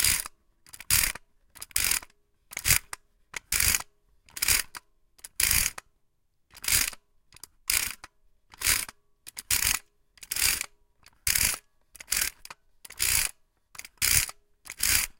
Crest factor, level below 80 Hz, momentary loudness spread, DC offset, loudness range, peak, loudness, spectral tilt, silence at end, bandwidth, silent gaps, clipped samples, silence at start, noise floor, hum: 28 dB; -46 dBFS; 21 LU; under 0.1%; 2 LU; -2 dBFS; -26 LUFS; 0.5 dB/octave; 0.1 s; 17.5 kHz; none; under 0.1%; 0 s; -71 dBFS; none